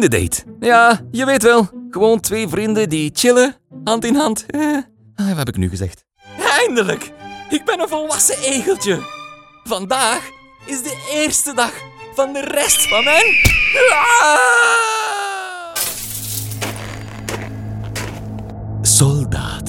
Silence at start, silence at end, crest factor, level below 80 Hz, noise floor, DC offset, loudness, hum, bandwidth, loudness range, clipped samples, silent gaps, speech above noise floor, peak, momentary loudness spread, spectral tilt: 0 s; 0 s; 16 dB; -38 dBFS; -37 dBFS; under 0.1%; -15 LUFS; none; 18 kHz; 8 LU; under 0.1%; none; 22 dB; 0 dBFS; 16 LU; -3 dB/octave